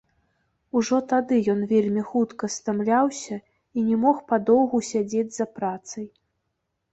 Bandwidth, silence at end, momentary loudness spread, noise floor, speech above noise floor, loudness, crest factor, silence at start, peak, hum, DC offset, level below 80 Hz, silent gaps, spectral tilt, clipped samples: 8.2 kHz; 0.85 s; 13 LU; -78 dBFS; 55 dB; -23 LUFS; 18 dB; 0.75 s; -6 dBFS; none; under 0.1%; -64 dBFS; none; -5.5 dB/octave; under 0.1%